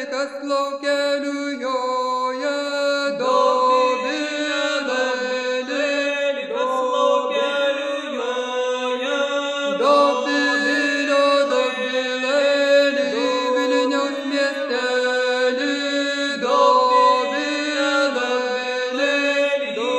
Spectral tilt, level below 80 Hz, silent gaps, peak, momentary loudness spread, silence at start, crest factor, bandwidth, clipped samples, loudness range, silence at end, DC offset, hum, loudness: -2 dB/octave; -72 dBFS; none; -4 dBFS; 7 LU; 0 s; 16 dB; 10.5 kHz; under 0.1%; 3 LU; 0 s; under 0.1%; none; -20 LUFS